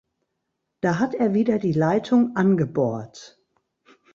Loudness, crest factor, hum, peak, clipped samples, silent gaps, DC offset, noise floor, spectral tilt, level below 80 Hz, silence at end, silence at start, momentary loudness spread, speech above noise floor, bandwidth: -22 LUFS; 16 dB; none; -6 dBFS; under 0.1%; none; under 0.1%; -78 dBFS; -8 dB/octave; -62 dBFS; 0.9 s; 0.85 s; 7 LU; 57 dB; 7.4 kHz